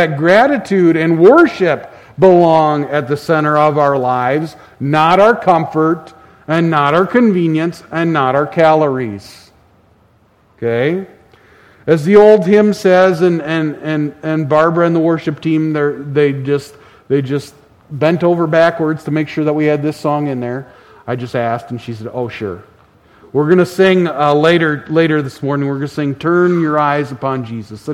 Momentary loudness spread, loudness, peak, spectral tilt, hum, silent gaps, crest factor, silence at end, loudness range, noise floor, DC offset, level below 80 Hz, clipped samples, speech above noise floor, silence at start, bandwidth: 13 LU; -13 LUFS; 0 dBFS; -7.5 dB/octave; none; none; 14 dB; 0 s; 7 LU; -52 dBFS; under 0.1%; -54 dBFS; 0.1%; 39 dB; 0 s; 13.5 kHz